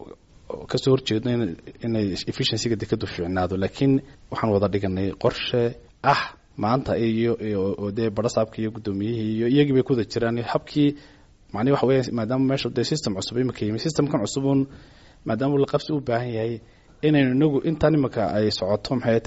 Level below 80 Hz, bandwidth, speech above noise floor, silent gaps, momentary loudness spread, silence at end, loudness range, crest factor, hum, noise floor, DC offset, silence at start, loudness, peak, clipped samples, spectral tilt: -50 dBFS; 8 kHz; 22 dB; none; 8 LU; 0 s; 2 LU; 16 dB; none; -45 dBFS; under 0.1%; 0 s; -24 LUFS; -6 dBFS; under 0.1%; -5.5 dB/octave